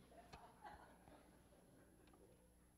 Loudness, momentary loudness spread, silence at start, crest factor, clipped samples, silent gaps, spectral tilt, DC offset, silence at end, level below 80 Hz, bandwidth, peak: -65 LUFS; 8 LU; 0 s; 22 dB; under 0.1%; none; -4.5 dB/octave; under 0.1%; 0 s; -76 dBFS; 15.5 kHz; -44 dBFS